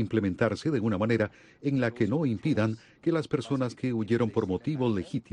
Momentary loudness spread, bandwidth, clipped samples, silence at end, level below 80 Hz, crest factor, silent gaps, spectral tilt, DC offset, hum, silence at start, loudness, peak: 4 LU; 10.5 kHz; under 0.1%; 0.1 s; -60 dBFS; 16 dB; none; -7.5 dB/octave; under 0.1%; none; 0 s; -29 LUFS; -12 dBFS